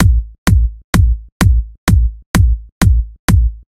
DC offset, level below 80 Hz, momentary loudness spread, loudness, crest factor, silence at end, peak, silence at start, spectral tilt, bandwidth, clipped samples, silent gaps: under 0.1%; -14 dBFS; 3 LU; -15 LUFS; 12 dB; 0.15 s; 0 dBFS; 0 s; -6 dB/octave; 16 kHz; under 0.1%; 0.38-0.46 s, 0.84-0.93 s, 1.32-1.40 s, 1.78-1.87 s, 2.26-2.34 s, 2.72-2.81 s, 3.19-3.28 s